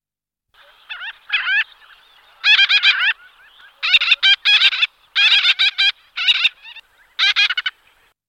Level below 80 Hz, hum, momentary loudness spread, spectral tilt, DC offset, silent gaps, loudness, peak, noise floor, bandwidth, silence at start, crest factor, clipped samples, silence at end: -68 dBFS; none; 16 LU; 5 dB/octave; under 0.1%; none; -14 LUFS; 0 dBFS; -82 dBFS; 15.5 kHz; 0.9 s; 18 dB; under 0.1%; 0.6 s